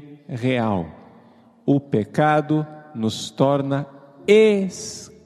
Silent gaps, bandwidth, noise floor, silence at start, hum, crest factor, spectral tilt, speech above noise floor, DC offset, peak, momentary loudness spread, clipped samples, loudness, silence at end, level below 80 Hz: none; 12.5 kHz; -51 dBFS; 0 s; none; 20 dB; -6 dB/octave; 31 dB; under 0.1%; -2 dBFS; 17 LU; under 0.1%; -21 LUFS; 0.2 s; -58 dBFS